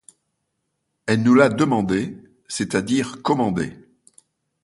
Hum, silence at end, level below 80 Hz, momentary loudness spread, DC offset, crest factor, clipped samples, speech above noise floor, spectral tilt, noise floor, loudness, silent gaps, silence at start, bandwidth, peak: none; 0.9 s; -54 dBFS; 16 LU; under 0.1%; 22 dB; under 0.1%; 56 dB; -6 dB/octave; -75 dBFS; -20 LUFS; none; 1.05 s; 11.5 kHz; 0 dBFS